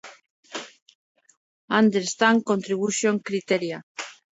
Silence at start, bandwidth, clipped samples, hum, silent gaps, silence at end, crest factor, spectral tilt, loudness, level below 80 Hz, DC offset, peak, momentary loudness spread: 0.05 s; 8 kHz; under 0.1%; none; 0.30-0.43 s, 0.82-0.86 s, 0.95-1.15 s, 1.37-1.68 s, 3.83-3.95 s; 0.2 s; 22 dB; -4 dB/octave; -23 LUFS; -74 dBFS; under 0.1%; -4 dBFS; 17 LU